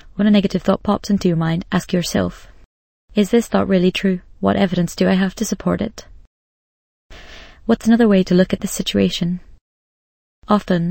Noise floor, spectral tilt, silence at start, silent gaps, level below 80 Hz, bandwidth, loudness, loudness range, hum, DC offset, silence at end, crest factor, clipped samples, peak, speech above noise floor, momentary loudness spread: -39 dBFS; -6 dB/octave; 0.05 s; 2.66-3.08 s, 6.27-7.10 s, 9.61-10.42 s; -42 dBFS; 17 kHz; -18 LUFS; 3 LU; none; under 0.1%; 0 s; 18 dB; under 0.1%; 0 dBFS; 22 dB; 8 LU